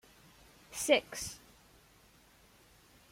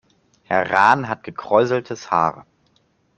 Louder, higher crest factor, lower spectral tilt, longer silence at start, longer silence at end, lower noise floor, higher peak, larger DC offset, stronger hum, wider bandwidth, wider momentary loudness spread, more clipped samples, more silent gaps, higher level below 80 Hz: second, -33 LUFS vs -19 LUFS; first, 26 dB vs 20 dB; second, -1.5 dB/octave vs -5.5 dB/octave; first, 0.7 s vs 0.5 s; first, 1.75 s vs 0.75 s; about the same, -63 dBFS vs -62 dBFS; second, -12 dBFS vs -2 dBFS; neither; neither; first, 16.5 kHz vs 8.6 kHz; first, 17 LU vs 9 LU; neither; neither; about the same, -66 dBFS vs -62 dBFS